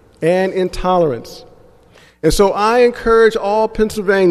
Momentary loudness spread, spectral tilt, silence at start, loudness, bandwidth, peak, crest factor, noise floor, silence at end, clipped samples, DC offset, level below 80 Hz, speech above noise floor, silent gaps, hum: 7 LU; -5 dB/octave; 0.2 s; -14 LUFS; 14 kHz; 0 dBFS; 14 dB; -47 dBFS; 0 s; under 0.1%; under 0.1%; -32 dBFS; 33 dB; none; none